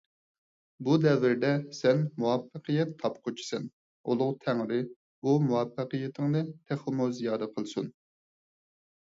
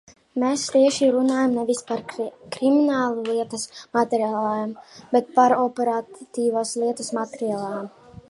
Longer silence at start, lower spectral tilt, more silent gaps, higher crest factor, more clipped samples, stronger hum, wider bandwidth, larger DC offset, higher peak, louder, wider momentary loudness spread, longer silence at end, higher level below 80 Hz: first, 0.8 s vs 0.35 s; first, -7 dB/octave vs -4 dB/octave; first, 3.73-4.04 s, 4.96-5.22 s vs none; about the same, 18 dB vs 18 dB; neither; neither; second, 7.8 kHz vs 11.5 kHz; neither; second, -12 dBFS vs -4 dBFS; second, -30 LUFS vs -23 LUFS; about the same, 11 LU vs 13 LU; first, 1.1 s vs 0.1 s; second, -74 dBFS vs -66 dBFS